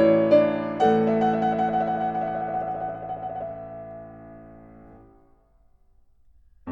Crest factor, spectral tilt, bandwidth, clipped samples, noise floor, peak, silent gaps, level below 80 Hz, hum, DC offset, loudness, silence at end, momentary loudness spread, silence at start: 18 dB; -8 dB/octave; 7.6 kHz; under 0.1%; -59 dBFS; -6 dBFS; none; -56 dBFS; none; under 0.1%; -24 LUFS; 0 s; 23 LU; 0 s